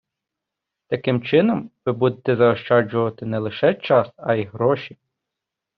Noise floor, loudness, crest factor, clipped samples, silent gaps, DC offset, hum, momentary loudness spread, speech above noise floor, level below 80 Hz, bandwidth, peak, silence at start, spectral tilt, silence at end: -84 dBFS; -20 LUFS; 18 dB; under 0.1%; none; under 0.1%; none; 8 LU; 64 dB; -62 dBFS; 5.4 kHz; -2 dBFS; 0.9 s; -5.5 dB/octave; 0.9 s